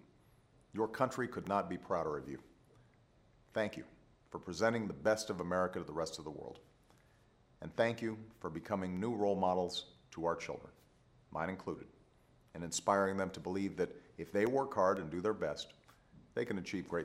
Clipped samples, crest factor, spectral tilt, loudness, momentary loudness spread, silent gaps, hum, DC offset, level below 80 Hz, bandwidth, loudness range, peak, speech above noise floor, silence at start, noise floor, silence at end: under 0.1%; 22 dB; -5 dB/octave; -38 LUFS; 16 LU; none; none; under 0.1%; -68 dBFS; 16 kHz; 5 LU; -16 dBFS; 31 dB; 0.75 s; -68 dBFS; 0 s